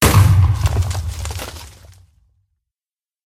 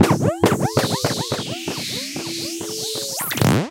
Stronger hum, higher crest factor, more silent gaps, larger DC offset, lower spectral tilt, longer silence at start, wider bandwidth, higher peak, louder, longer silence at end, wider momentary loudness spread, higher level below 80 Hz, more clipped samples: neither; about the same, 18 dB vs 20 dB; neither; neither; about the same, -5 dB/octave vs -4.5 dB/octave; about the same, 0 s vs 0 s; about the same, 16 kHz vs 17 kHz; about the same, 0 dBFS vs 0 dBFS; first, -17 LUFS vs -21 LUFS; first, 1.55 s vs 0 s; first, 18 LU vs 8 LU; first, -26 dBFS vs -50 dBFS; neither